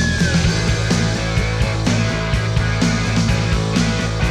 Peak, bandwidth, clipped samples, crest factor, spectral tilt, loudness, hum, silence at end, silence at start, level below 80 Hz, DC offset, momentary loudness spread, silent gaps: -4 dBFS; 12 kHz; under 0.1%; 14 dB; -5 dB/octave; -18 LUFS; none; 0 s; 0 s; -26 dBFS; under 0.1%; 3 LU; none